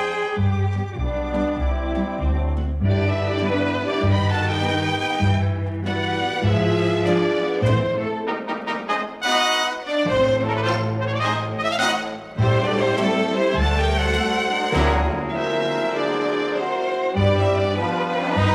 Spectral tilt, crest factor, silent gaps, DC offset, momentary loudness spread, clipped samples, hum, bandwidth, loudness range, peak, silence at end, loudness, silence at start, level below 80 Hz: -6 dB/octave; 14 dB; none; under 0.1%; 5 LU; under 0.1%; none; 12 kHz; 1 LU; -6 dBFS; 0 s; -21 LUFS; 0 s; -32 dBFS